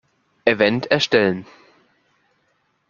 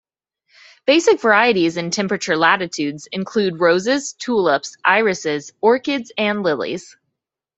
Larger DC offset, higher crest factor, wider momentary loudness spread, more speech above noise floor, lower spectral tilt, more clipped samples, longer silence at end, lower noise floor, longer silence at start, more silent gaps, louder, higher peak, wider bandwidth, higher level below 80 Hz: neither; about the same, 20 dB vs 18 dB; second, 6 LU vs 10 LU; second, 48 dB vs 61 dB; about the same, -5 dB/octave vs -4 dB/octave; neither; first, 1.45 s vs 0.75 s; second, -66 dBFS vs -79 dBFS; second, 0.45 s vs 0.85 s; neither; about the same, -18 LUFS vs -18 LUFS; about the same, -2 dBFS vs -2 dBFS; second, 7.2 kHz vs 8.2 kHz; about the same, -60 dBFS vs -64 dBFS